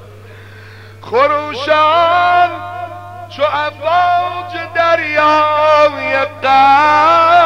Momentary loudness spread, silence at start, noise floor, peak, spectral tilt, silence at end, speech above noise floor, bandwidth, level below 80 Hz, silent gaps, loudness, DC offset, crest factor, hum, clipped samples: 14 LU; 0 s; -35 dBFS; 0 dBFS; -4.5 dB/octave; 0 s; 24 dB; 10.5 kHz; -54 dBFS; none; -12 LUFS; 0.4%; 12 dB; 50 Hz at -35 dBFS; under 0.1%